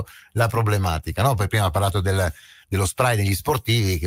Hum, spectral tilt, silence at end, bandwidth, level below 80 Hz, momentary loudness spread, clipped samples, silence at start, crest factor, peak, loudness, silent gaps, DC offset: none; -5 dB/octave; 0 s; 16 kHz; -38 dBFS; 4 LU; under 0.1%; 0 s; 18 dB; -4 dBFS; -22 LUFS; none; under 0.1%